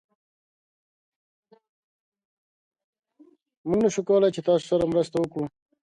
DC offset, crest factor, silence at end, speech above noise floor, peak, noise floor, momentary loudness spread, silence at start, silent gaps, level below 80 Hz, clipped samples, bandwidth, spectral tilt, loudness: under 0.1%; 18 dB; 0.4 s; 35 dB; -10 dBFS; -58 dBFS; 12 LU; 3.65 s; none; -62 dBFS; under 0.1%; 11 kHz; -6.5 dB/octave; -24 LUFS